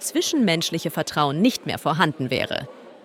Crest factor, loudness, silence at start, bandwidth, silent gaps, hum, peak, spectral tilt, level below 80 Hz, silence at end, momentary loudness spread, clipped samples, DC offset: 18 dB; -22 LUFS; 0 s; 17 kHz; none; none; -4 dBFS; -4 dB/octave; -64 dBFS; 0.1 s; 6 LU; under 0.1%; under 0.1%